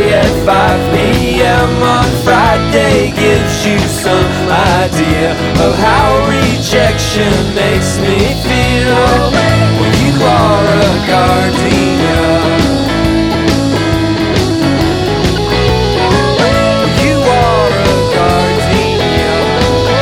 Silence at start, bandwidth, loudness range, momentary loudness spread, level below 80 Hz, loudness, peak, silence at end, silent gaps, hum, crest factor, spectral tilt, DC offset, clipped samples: 0 s; 18 kHz; 2 LU; 3 LU; -22 dBFS; -10 LUFS; 0 dBFS; 0 s; none; none; 10 dB; -5.5 dB/octave; under 0.1%; under 0.1%